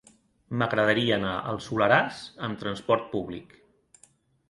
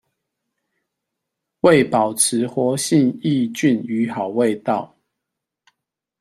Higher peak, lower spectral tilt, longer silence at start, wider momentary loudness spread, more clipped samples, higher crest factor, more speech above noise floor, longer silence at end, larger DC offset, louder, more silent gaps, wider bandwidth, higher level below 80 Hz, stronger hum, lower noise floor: second, -6 dBFS vs -2 dBFS; first, -6 dB/octave vs -4.5 dB/octave; second, 0.5 s vs 1.65 s; first, 13 LU vs 8 LU; neither; about the same, 22 dB vs 18 dB; second, 35 dB vs 64 dB; second, 1.05 s vs 1.35 s; neither; second, -26 LUFS vs -18 LUFS; neither; second, 11.5 kHz vs 14.5 kHz; about the same, -58 dBFS vs -60 dBFS; neither; second, -62 dBFS vs -82 dBFS